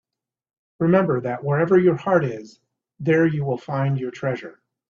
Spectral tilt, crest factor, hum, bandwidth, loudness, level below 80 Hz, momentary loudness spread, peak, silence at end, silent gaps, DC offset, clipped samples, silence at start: -9 dB/octave; 18 dB; none; 7.2 kHz; -21 LUFS; -62 dBFS; 11 LU; -4 dBFS; 0.4 s; none; under 0.1%; under 0.1%; 0.8 s